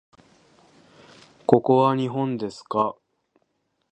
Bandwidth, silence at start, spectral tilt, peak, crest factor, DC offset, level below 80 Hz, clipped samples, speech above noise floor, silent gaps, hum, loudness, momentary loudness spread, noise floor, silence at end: 9 kHz; 1.5 s; -8 dB/octave; 0 dBFS; 24 dB; under 0.1%; -66 dBFS; under 0.1%; 51 dB; none; none; -22 LUFS; 11 LU; -72 dBFS; 1 s